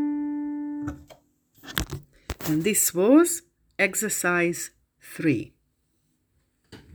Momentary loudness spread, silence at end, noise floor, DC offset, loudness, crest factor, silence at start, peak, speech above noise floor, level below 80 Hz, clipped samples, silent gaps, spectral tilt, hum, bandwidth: 21 LU; 0.15 s; -71 dBFS; under 0.1%; -24 LUFS; 26 dB; 0 s; 0 dBFS; 49 dB; -48 dBFS; under 0.1%; none; -4 dB/octave; none; over 20 kHz